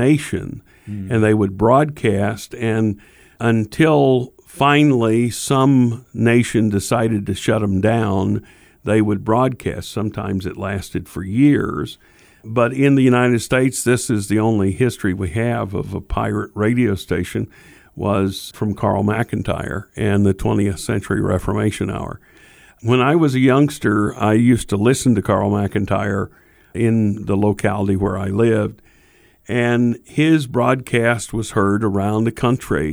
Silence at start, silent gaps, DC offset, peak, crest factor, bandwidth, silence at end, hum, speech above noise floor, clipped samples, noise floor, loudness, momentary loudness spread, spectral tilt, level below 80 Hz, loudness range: 0 s; none; under 0.1%; -2 dBFS; 16 dB; over 20 kHz; 0 s; none; 35 dB; under 0.1%; -52 dBFS; -18 LUFS; 10 LU; -6.5 dB/octave; -42 dBFS; 5 LU